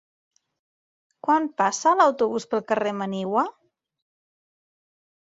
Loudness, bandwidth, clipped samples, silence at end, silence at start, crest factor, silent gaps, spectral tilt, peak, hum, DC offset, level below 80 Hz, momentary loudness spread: -23 LUFS; 8 kHz; under 0.1%; 1.75 s; 1.25 s; 20 dB; none; -4.5 dB/octave; -6 dBFS; none; under 0.1%; -74 dBFS; 9 LU